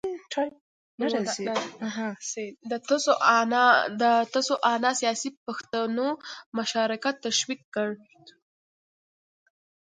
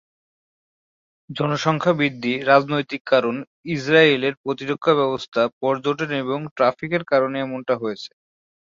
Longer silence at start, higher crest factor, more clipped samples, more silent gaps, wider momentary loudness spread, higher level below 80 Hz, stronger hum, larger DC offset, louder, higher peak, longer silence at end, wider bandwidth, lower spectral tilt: second, 0.05 s vs 1.3 s; about the same, 22 dB vs 20 dB; neither; first, 0.61-0.98 s, 5.37-5.46 s, 6.46-6.52 s, 7.64-7.72 s vs 3.01-3.05 s, 3.47-3.64 s, 4.37-4.44 s, 5.28-5.32 s, 5.53-5.61 s, 6.51-6.56 s; first, 13 LU vs 10 LU; second, -76 dBFS vs -64 dBFS; neither; neither; second, -26 LUFS vs -21 LUFS; second, -6 dBFS vs -2 dBFS; first, 1.6 s vs 0.65 s; first, 9.6 kHz vs 7.6 kHz; second, -2.5 dB/octave vs -6 dB/octave